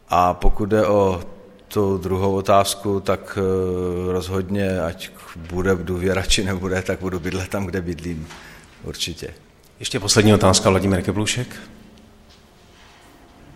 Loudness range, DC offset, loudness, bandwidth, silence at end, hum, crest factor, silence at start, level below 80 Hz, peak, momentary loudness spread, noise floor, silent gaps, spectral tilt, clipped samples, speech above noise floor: 5 LU; under 0.1%; -20 LUFS; 16 kHz; 1.8 s; none; 20 dB; 0.1 s; -32 dBFS; -2 dBFS; 17 LU; -49 dBFS; none; -4.5 dB/octave; under 0.1%; 29 dB